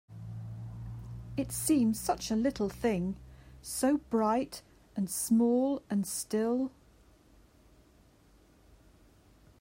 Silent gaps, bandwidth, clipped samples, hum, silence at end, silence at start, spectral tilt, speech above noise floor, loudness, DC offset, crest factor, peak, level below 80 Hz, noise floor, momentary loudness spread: none; 16 kHz; under 0.1%; none; 2.9 s; 0.1 s; -5 dB/octave; 32 dB; -31 LUFS; under 0.1%; 16 dB; -16 dBFS; -56 dBFS; -62 dBFS; 16 LU